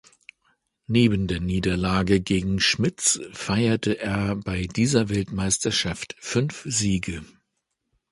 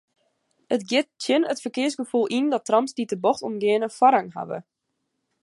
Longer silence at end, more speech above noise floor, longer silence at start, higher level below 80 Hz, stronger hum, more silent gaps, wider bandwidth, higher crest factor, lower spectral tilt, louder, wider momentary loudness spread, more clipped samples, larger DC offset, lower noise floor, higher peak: about the same, 0.85 s vs 0.8 s; about the same, 54 dB vs 55 dB; first, 0.9 s vs 0.7 s; first, -42 dBFS vs -76 dBFS; neither; neither; about the same, 11.5 kHz vs 11.5 kHz; about the same, 20 dB vs 20 dB; about the same, -4 dB/octave vs -4 dB/octave; about the same, -23 LUFS vs -23 LUFS; second, 6 LU vs 9 LU; neither; neither; about the same, -78 dBFS vs -78 dBFS; about the same, -6 dBFS vs -4 dBFS